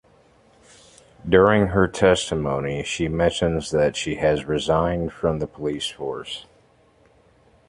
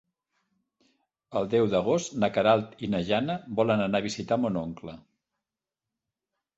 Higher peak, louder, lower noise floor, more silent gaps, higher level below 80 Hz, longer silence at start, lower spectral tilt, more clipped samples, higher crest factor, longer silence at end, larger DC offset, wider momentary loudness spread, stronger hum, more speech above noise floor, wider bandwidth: first, -2 dBFS vs -8 dBFS; first, -22 LUFS vs -27 LUFS; second, -57 dBFS vs -89 dBFS; neither; first, -42 dBFS vs -60 dBFS; about the same, 1.25 s vs 1.3 s; about the same, -5.5 dB/octave vs -5.5 dB/octave; neither; about the same, 22 dB vs 20 dB; second, 1.25 s vs 1.55 s; neither; first, 12 LU vs 9 LU; neither; second, 36 dB vs 63 dB; first, 11.5 kHz vs 8.2 kHz